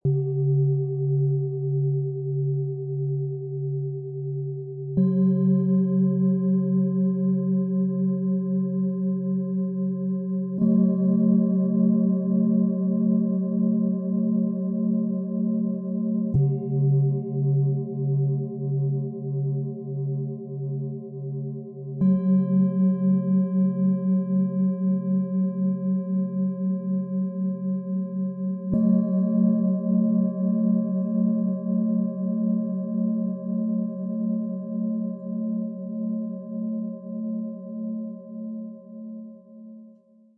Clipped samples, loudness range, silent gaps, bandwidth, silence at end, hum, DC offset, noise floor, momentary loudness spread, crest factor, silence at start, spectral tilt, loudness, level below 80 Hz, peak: under 0.1%; 7 LU; none; 1.7 kHz; 0.5 s; none; under 0.1%; -54 dBFS; 10 LU; 12 dB; 0.05 s; -15.5 dB/octave; -25 LUFS; -62 dBFS; -12 dBFS